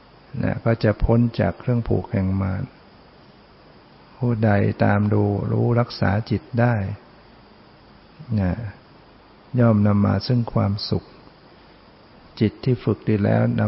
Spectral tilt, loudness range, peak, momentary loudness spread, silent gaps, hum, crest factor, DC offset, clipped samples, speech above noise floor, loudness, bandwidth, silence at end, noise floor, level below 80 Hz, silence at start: -11 dB/octave; 5 LU; -6 dBFS; 9 LU; none; none; 16 dB; under 0.1%; under 0.1%; 29 dB; -21 LUFS; 5.8 kHz; 0 s; -49 dBFS; -42 dBFS; 0.35 s